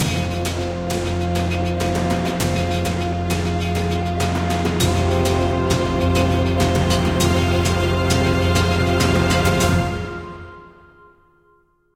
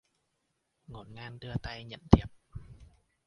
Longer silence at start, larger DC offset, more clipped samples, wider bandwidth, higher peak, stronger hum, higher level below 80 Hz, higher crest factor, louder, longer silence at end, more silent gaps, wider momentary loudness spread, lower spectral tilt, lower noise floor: second, 0 s vs 0.9 s; neither; neither; first, 16.5 kHz vs 7 kHz; about the same, -4 dBFS vs -2 dBFS; neither; first, -32 dBFS vs -40 dBFS; second, 16 dB vs 30 dB; first, -19 LUFS vs -29 LUFS; first, 1.3 s vs 0.55 s; neither; second, 6 LU vs 24 LU; second, -5.5 dB/octave vs -8 dB/octave; second, -58 dBFS vs -80 dBFS